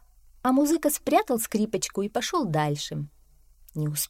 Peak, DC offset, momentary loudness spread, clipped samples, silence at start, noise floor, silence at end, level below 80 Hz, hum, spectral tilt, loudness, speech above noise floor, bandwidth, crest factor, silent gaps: -8 dBFS; under 0.1%; 11 LU; under 0.1%; 0.45 s; -56 dBFS; 0.05 s; -56 dBFS; none; -4.5 dB/octave; -26 LUFS; 30 dB; 16.5 kHz; 18 dB; none